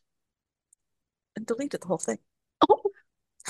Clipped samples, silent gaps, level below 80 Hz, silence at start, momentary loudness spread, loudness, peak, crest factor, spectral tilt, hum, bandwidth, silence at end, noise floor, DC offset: under 0.1%; none; -72 dBFS; 1.35 s; 16 LU; -28 LUFS; -6 dBFS; 26 dB; -4.5 dB/octave; none; 12.5 kHz; 0 s; -87 dBFS; under 0.1%